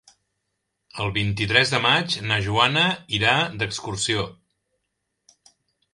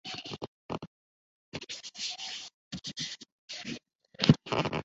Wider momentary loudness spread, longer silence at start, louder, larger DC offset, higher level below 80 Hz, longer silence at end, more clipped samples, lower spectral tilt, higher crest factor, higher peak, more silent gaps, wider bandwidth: second, 9 LU vs 18 LU; first, 0.95 s vs 0.05 s; first, -21 LUFS vs -34 LUFS; neither; first, -50 dBFS vs -60 dBFS; first, 1.6 s vs 0 s; neither; about the same, -3.5 dB/octave vs -4.5 dB/octave; second, 24 dB vs 30 dB; first, 0 dBFS vs -4 dBFS; second, none vs 0.48-0.69 s, 0.87-1.52 s, 2.54-2.71 s, 3.32-3.48 s, 3.95-3.99 s; first, 11.5 kHz vs 8 kHz